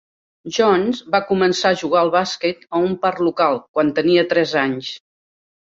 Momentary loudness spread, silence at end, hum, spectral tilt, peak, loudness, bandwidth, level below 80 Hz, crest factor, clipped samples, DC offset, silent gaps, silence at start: 8 LU; 0.7 s; none; -5 dB/octave; -2 dBFS; -18 LUFS; 7.8 kHz; -60 dBFS; 16 dB; under 0.1%; under 0.1%; 3.69-3.74 s; 0.45 s